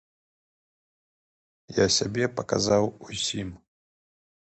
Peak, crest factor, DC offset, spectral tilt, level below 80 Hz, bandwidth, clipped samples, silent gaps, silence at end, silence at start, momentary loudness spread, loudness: -8 dBFS; 22 dB; under 0.1%; -3.5 dB/octave; -54 dBFS; 9 kHz; under 0.1%; none; 1 s; 1.7 s; 10 LU; -26 LUFS